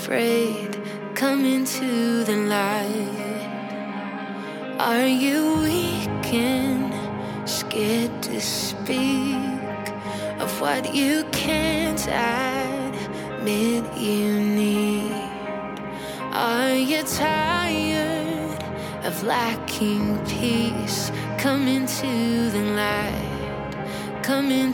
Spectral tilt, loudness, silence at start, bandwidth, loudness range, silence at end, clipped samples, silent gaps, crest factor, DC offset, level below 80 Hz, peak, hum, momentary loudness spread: -4.5 dB/octave; -24 LUFS; 0 s; 17.5 kHz; 2 LU; 0 s; under 0.1%; none; 16 dB; under 0.1%; -48 dBFS; -8 dBFS; none; 9 LU